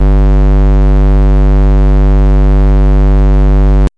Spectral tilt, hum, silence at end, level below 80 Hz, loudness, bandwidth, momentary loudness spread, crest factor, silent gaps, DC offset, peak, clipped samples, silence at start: -9.5 dB/octave; none; 0.1 s; -6 dBFS; -10 LUFS; 3.8 kHz; 0 LU; 2 dB; none; under 0.1%; -4 dBFS; under 0.1%; 0 s